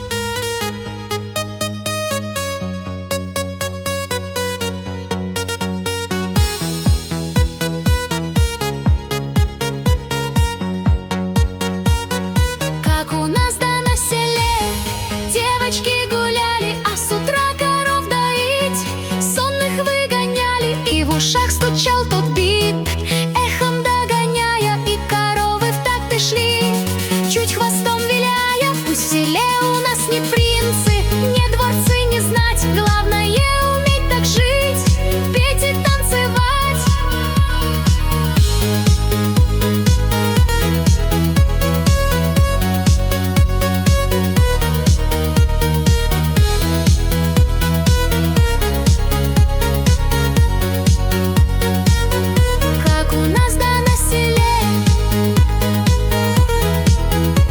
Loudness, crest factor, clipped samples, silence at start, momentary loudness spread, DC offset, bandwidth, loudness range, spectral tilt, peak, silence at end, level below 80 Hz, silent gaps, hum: -17 LUFS; 12 dB; under 0.1%; 0 s; 6 LU; under 0.1%; over 20 kHz; 4 LU; -4.5 dB/octave; -4 dBFS; 0 s; -22 dBFS; none; none